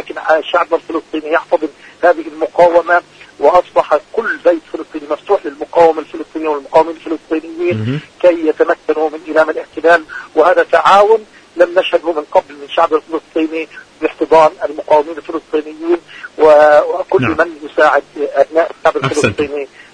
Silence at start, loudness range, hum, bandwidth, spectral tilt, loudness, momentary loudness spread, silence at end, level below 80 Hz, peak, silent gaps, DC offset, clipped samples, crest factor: 0 s; 4 LU; none; 10.5 kHz; -5.5 dB/octave; -13 LUFS; 11 LU; 0.3 s; -50 dBFS; 0 dBFS; none; under 0.1%; 0.3%; 14 dB